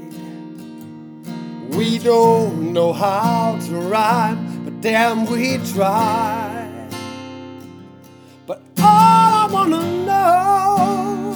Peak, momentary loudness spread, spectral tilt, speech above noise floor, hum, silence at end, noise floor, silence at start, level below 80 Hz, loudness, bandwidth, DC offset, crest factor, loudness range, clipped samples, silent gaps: 0 dBFS; 21 LU; -5.5 dB/octave; 26 dB; none; 0 s; -43 dBFS; 0 s; -72 dBFS; -16 LUFS; over 20 kHz; under 0.1%; 16 dB; 6 LU; under 0.1%; none